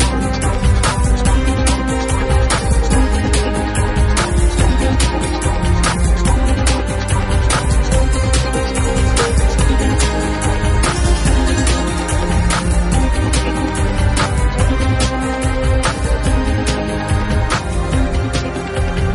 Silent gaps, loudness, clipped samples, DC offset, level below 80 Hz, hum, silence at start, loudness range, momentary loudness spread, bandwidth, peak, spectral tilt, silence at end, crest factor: none; -16 LUFS; under 0.1%; under 0.1%; -16 dBFS; none; 0 s; 1 LU; 3 LU; 11.5 kHz; -2 dBFS; -5 dB/octave; 0 s; 12 dB